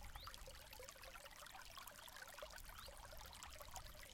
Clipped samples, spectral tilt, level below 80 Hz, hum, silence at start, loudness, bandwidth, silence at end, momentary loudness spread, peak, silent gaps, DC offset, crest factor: under 0.1%; -1.5 dB/octave; -64 dBFS; none; 0 s; -56 LUFS; 17 kHz; 0 s; 2 LU; -32 dBFS; none; under 0.1%; 24 dB